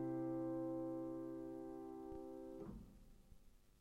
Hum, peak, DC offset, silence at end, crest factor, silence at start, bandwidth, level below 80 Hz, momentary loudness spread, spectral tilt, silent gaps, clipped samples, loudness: none; -36 dBFS; under 0.1%; 0 s; 12 dB; 0 s; 12.5 kHz; -66 dBFS; 16 LU; -9 dB/octave; none; under 0.1%; -48 LUFS